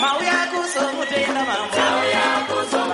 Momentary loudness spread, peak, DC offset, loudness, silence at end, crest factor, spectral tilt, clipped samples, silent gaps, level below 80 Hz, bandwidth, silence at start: 4 LU; -6 dBFS; under 0.1%; -20 LUFS; 0 s; 14 dB; -2 dB/octave; under 0.1%; none; -64 dBFS; 11.5 kHz; 0 s